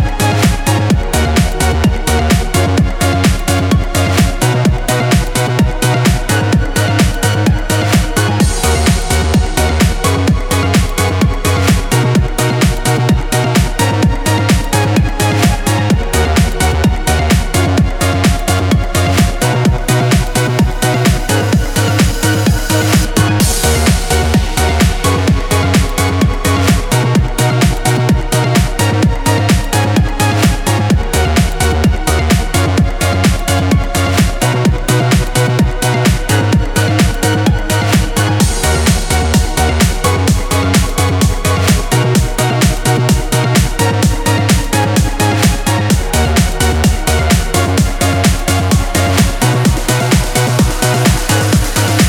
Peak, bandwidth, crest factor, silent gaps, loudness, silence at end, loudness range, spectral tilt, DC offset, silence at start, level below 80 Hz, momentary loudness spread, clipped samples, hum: 0 dBFS; 19 kHz; 12 dB; none; -12 LUFS; 0 s; 1 LU; -5 dB/octave; under 0.1%; 0 s; -18 dBFS; 2 LU; under 0.1%; none